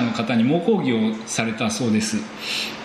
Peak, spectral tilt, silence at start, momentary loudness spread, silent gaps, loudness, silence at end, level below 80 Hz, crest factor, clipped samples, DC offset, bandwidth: -2 dBFS; -4.5 dB/octave; 0 s; 6 LU; none; -22 LUFS; 0 s; -58 dBFS; 20 dB; under 0.1%; under 0.1%; 12.5 kHz